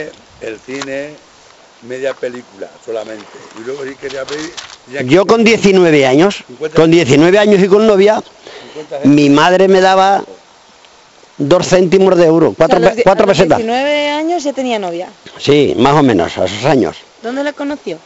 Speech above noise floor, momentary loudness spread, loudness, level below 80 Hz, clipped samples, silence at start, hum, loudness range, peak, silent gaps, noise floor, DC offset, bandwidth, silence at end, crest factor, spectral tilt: 32 dB; 19 LU; -11 LUFS; -44 dBFS; under 0.1%; 0 s; none; 14 LU; 0 dBFS; none; -43 dBFS; under 0.1%; 8.2 kHz; 0.1 s; 12 dB; -5.5 dB/octave